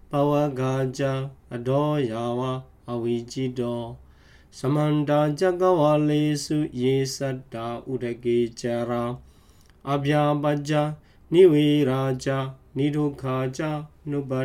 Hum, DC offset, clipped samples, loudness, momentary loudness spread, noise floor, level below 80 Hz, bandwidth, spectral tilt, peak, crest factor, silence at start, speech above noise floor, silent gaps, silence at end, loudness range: none; under 0.1%; under 0.1%; -24 LUFS; 12 LU; -54 dBFS; -54 dBFS; 15.5 kHz; -7 dB/octave; -6 dBFS; 18 dB; 0.1 s; 30 dB; none; 0 s; 6 LU